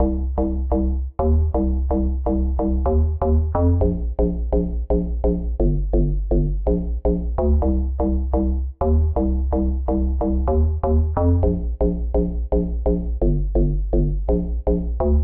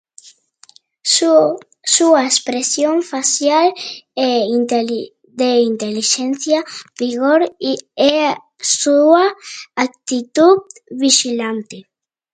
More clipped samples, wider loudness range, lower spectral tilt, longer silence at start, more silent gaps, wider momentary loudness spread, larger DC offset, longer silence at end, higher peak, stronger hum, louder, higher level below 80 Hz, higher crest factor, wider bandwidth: neither; about the same, 1 LU vs 3 LU; first, -14.5 dB/octave vs -1.5 dB/octave; second, 0 s vs 1.05 s; neither; second, 4 LU vs 12 LU; first, 0.1% vs under 0.1%; second, 0 s vs 0.5 s; second, -6 dBFS vs 0 dBFS; neither; second, -21 LUFS vs -15 LUFS; first, -22 dBFS vs -68 dBFS; about the same, 12 dB vs 16 dB; second, 2.1 kHz vs 9.6 kHz